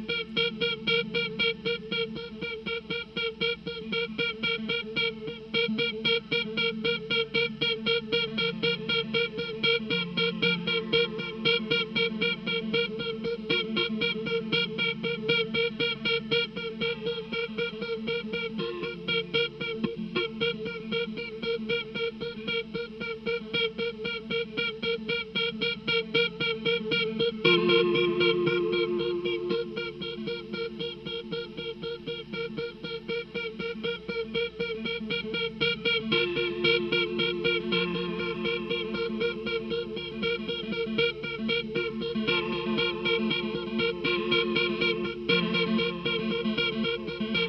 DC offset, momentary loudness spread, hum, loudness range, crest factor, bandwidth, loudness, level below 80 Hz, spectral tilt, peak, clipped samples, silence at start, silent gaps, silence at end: under 0.1%; 9 LU; none; 6 LU; 20 dB; 6.4 kHz; -28 LUFS; -58 dBFS; -6 dB/octave; -8 dBFS; under 0.1%; 0 s; none; 0 s